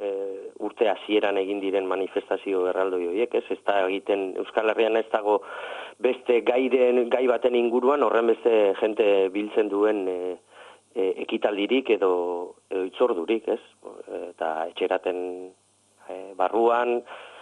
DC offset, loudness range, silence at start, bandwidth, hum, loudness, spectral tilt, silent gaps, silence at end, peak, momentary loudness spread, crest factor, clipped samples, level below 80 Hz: under 0.1%; 6 LU; 0 s; 10 kHz; none; -24 LUFS; -5 dB/octave; none; 0 s; -8 dBFS; 14 LU; 16 dB; under 0.1%; -72 dBFS